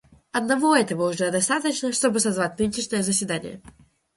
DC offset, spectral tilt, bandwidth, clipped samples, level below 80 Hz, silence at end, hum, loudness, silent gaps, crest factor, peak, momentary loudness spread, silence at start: under 0.1%; -3.5 dB/octave; 12 kHz; under 0.1%; -58 dBFS; 0.45 s; none; -23 LUFS; none; 20 dB; -4 dBFS; 9 LU; 0.35 s